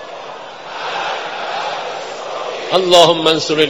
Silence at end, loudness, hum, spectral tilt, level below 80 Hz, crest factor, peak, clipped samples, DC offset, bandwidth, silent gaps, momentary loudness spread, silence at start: 0 s; -15 LUFS; none; -3 dB/octave; -56 dBFS; 16 dB; 0 dBFS; 0.3%; 0.4%; 20 kHz; none; 20 LU; 0 s